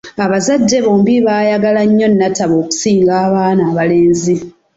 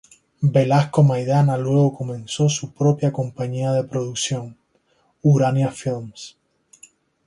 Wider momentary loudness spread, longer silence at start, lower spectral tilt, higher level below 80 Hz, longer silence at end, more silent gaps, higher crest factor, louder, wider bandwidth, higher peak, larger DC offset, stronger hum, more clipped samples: second, 4 LU vs 13 LU; second, 0.05 s vs 0.4 s; about the same, -5.5 dB/octave vs -6.5 dB/octave; first, -50 dBFS vs -58 dBFS; second, 0.25 s vs 0.95 s; neither; second, 10 dB vs 16 dB; first, -12 LUFS vs -20 LUFS; second, 8 kHz vs 11 kHz; about the same, -2 dBFS vs -4 dBFS; neither; neither; neither